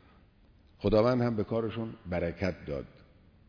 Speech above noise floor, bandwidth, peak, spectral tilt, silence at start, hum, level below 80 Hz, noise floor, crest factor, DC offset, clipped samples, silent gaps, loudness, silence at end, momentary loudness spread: 31 dB; 5.4 kHz; -14 dBFS; -8.5 dB/octave; 0.8 s; none; -50 dBFS; -61 dBFS; 18 dB; under 0.1%; under 0.1%; none; -31 LUFS; 0.65 s; 14 LU